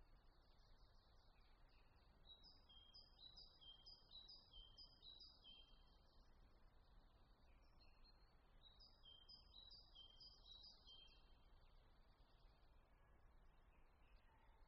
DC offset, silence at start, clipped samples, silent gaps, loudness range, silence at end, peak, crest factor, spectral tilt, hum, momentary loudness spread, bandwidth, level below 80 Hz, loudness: under 0.1%; 0 s; under 0.1%; none; 5 LU; 0 s; -52 dBFS; 16 dB; -1.5 dB/octave; none; 5 LU; 5.8 kHz; -72 dBFS; -65 LUFS